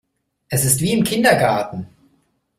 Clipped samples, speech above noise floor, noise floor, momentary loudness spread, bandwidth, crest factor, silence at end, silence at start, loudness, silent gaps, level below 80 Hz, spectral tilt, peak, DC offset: under 0.1%; 46 dB; -63 dBFS; 12 LU; 16 kHz; 20 dB; 0.75 s; 0.5 s; -17 LUFS; none; -50 dBFS; -4 dB/octave; 0 dBFS; under 0.1%